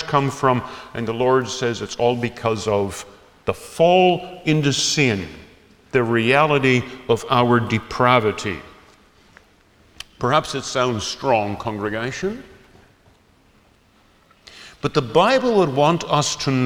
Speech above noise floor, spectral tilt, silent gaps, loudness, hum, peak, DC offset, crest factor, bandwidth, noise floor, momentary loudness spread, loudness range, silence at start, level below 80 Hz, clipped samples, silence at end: 36 dB; -5 dB/octave; none; -19 LUFS; none; -2 dBFS; under 0.1%; 20 dB; 17.5 kHz; -56 dBFS; 12 LU; 7 LU; 0 s; -50 dBFS; under 0.1%; 0 s